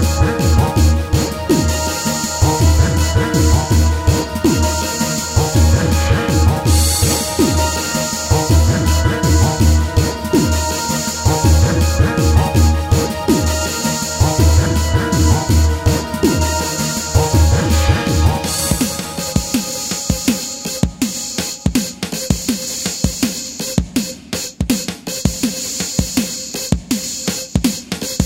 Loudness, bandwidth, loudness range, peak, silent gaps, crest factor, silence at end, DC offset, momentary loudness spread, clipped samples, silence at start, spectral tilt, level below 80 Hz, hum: -16 LUFS; 16.5 kHz; 5 LU; 0 dBFS; none; 14 dB; 0 s; under 0.1%; 7 LU; under 0.1%; 0 s; -4.5 dB/octave; -22 dBFS; none